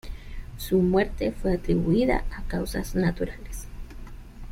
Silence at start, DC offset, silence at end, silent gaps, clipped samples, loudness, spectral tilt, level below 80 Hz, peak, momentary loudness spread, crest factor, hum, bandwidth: 0.05 s; under 0.1%; 0 s; none; under 0.1%; -26 LUFS; -7 dB/octave; -34 dBFS; -8 dBFS; 22 LU; 18 dB; none; 16 kHz